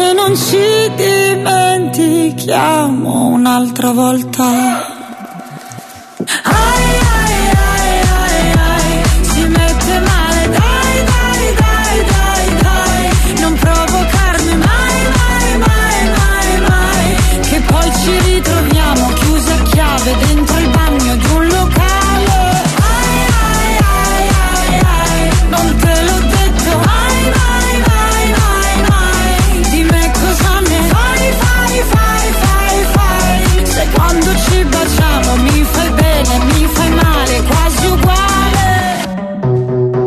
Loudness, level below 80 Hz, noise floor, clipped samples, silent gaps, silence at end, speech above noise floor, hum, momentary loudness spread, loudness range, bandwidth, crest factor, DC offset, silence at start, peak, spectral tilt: -11 LUFS; -14 dBFS; -30 dBFS; under 0.1%; none; 0 s; 19 dB; none; 2 LU; 1 LU; 14 kHz; 10 dB; under 0.1%; 0 s; 0 dBFS; -4.5 dB/octave